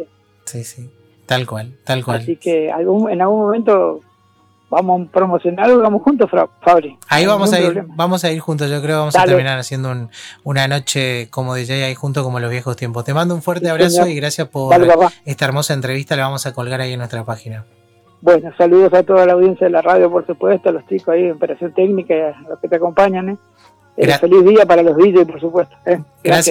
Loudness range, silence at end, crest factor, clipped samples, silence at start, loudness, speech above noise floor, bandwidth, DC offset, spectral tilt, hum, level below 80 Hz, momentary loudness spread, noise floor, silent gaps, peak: 6 LU; 0 s; 12 dB; under 0.1%; 0 s; -14 LUFS; 40 dB; 17 kHz; under 0.1%; -5.5 dB/octave; none; -54 dBFS; 13 LU; -54 dBFS; none; -2 dBFS